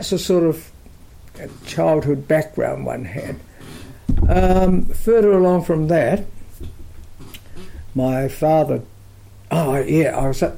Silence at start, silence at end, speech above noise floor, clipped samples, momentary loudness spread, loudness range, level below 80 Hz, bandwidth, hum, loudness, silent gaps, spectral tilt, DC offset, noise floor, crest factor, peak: 0 s; 0 s; 25 dB; under 0.1%; 23 LU; 5 LU; -28 dBFS; 16.5 kHz; none; -18 LUFS; none; -7 dB/octave; under 0.1%; -42 dBFS; 12 dB; -6 dBFS